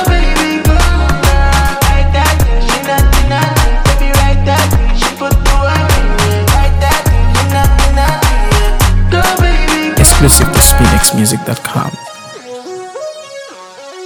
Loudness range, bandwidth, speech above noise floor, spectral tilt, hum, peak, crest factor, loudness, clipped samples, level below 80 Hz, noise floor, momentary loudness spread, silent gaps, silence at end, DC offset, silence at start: 3 LU; over 20 kHz; 20 dB; -4 dB/octave; none; 0 dBFS; 10 dB; -10 LUFS; 0.6%; -12 dBFS; -30 dBFS; 18 LU; none; 0 s; under 0.1%; 0 s